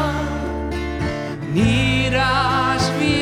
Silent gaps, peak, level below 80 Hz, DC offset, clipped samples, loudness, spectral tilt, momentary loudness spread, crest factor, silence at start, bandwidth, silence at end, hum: none; -4 dBFS; -32 dBFS; under 0.1%; under 0.1%; -19 LUFS; -5.5 dB/octave; 8 LU; 14 dB; 0 s; 15 kHz; 0 s; none